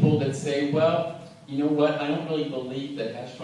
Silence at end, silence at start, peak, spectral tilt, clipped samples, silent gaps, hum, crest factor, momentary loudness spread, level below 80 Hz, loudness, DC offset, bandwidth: 0 s; 0 s; -8 dBFS; -7 dB/octave; under 0.1%; none; none; 18 dB; 11 LU; -70 dBFS; -26 LUFS; under 0.1%; 11.5 kHz